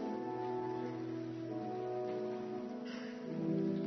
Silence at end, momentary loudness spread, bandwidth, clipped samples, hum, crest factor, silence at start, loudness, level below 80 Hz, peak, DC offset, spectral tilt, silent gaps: 0 s; 6 LU; 6.2 kHz; under 0.1%; none; 14 dB; 0 s; -41 LUFS; -82 dBFS; -26 dBFS; under 0.1%; -7 dB/octave; none